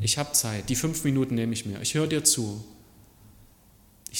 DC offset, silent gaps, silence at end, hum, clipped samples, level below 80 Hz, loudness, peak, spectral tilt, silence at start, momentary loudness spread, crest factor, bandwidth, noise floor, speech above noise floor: under 0.1%; none; 0 s; none; under 0.1%; -54 dBFS; -25 LUFS; -6 dBFS; -3.5 dB/octave; 0 s; 10 LU; 22 dB; 17.5 kHz; -57 dBFS; 30 dB